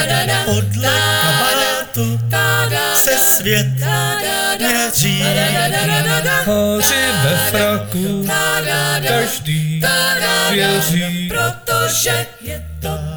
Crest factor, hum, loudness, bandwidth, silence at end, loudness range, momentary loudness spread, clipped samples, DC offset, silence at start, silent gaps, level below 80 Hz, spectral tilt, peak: 16 dB; none; -14 LUFS; over 20 kHz; 0 s; 2 LU; 6 LU; under 0.1%; under 0.1%; 0 s; none; -40 dBFS; -3 dB/octave; 0 dBFS